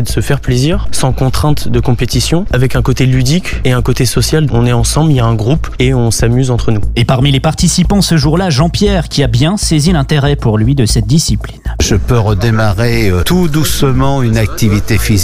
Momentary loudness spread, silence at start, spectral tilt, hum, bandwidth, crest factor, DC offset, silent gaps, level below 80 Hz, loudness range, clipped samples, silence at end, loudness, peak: 3 LU; 0 s; -5.5 dB/octave; none; 16 kHz; 10 dB; under 0.1%; none; -20 dBFS; 1 LU; under 0.1%; 0 s; -11 LUFS; 0 dBFS